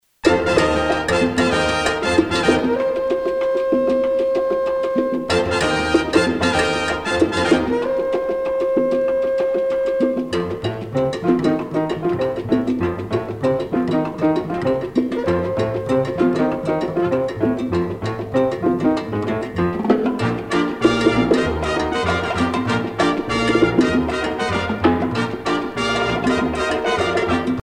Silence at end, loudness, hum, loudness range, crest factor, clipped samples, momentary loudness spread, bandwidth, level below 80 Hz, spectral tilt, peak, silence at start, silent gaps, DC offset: 0 s; -19 LUFS; none; 2 LU; 16 dB; under 0.1%; 5 LU; 12.5 kHz; -42 dBFS; -5.5 dB/octave; -2 dBFS; 0.25 s; none; under 0.1%